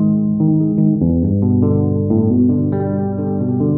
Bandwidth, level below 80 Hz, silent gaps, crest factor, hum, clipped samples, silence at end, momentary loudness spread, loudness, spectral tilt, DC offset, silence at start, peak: 1.9 kHz; -38 dBFS; none; 12 dB; none; under 0.1%; 0 s; 5 LU; -16 LUFS; -16.5 dB/octave; under 0.1%; 0 s; -2 dBFS